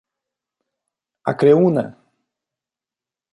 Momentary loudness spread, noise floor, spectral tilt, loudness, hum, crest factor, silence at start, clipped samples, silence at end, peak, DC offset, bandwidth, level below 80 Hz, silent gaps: 15 LU; -89 dBFS; -9 dB/octave; -17 LUFS; none; 20 dB; 1.25 s; under 0.1%; 1.4 s; -2 dBFS; under 0.1%; 10.5 kHz; -68 dBFS; none